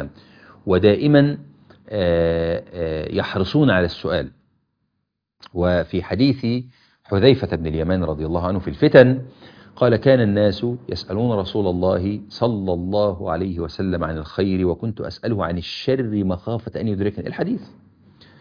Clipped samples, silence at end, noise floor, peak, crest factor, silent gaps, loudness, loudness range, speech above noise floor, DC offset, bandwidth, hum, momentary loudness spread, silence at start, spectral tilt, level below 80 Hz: under 0.1%; 0.75 s; -76 dBFS; 0 dBFS; 20 dB; none; -20 LUFS; 6 LU; 57 dB; under 0.1%; 5.2 kHz; none; 11 LU; 0 s; -8.5 dB/octave; -42 dBFS